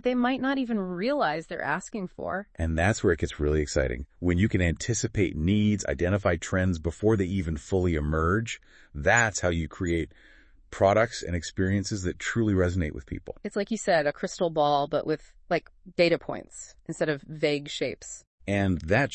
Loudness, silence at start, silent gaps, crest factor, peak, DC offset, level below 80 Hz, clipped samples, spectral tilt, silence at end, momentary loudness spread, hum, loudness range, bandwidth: -27 LUFS; 0.05 s; 18.27-18.38 s; 20 dB; -6 dBFS; under 0.1%; -44 dBFS; under 0.1%; -5.5 dB/octave; 0 s; 10 LU; none; 2 LU; 8.8 kHz